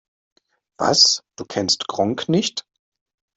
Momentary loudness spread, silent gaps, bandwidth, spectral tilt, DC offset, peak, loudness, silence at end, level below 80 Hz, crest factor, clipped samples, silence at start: 12 LU; none; 8.4 kHz; -3 dB/octave; under 0.1%; -2 dBFS; -18 LUFS; 0.75 s; -64 dBFS; 20 dB; under 0.1%; 0.8 s